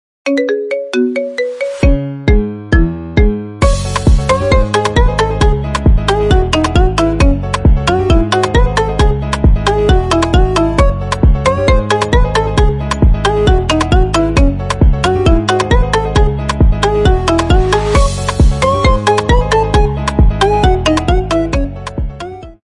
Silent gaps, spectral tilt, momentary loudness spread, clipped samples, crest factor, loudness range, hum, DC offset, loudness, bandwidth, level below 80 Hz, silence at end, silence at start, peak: none; -6 dB/octave; 4 LU; under 0.1%; 10 dB; 2 LU; none; under 0.1%; -13 LUFS; 11.5 kHz; -14 dBFS; 0.1 s; 0.25 s; 0 dBFS